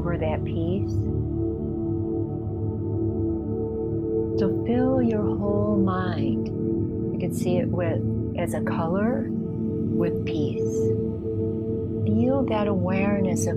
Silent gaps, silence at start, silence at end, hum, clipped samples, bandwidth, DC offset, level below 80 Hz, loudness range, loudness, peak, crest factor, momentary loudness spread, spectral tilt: none; 0 s; 0 s; none; under 0.1%; 14.5 kHz; under 0.1%; -42 dBFS; 3 LU; -25 LUFS; -10 dBFS; 14 dB; 5 LU; -8 dB/octave